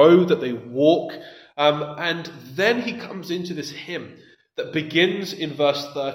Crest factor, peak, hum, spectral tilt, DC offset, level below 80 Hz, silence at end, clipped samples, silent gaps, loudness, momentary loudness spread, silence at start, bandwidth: 20 dB; -2 dBFS; none; -5.5 dB/octave; under 0.1%; -70 dBFS; 0 s; under 0.1%; none; -22 LUFS; 15 LU; 0 s; 16 kHz